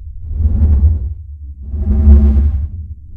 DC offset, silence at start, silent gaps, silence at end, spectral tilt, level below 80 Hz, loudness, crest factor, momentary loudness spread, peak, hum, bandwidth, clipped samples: under 0.1%; 0 s; none; 0 s; -12.5 dB/octave; -14 dBFS; -13 LUFS; 12 dB; 20 LU; 0 dBFS; none; 1.6 kHz; 0.3%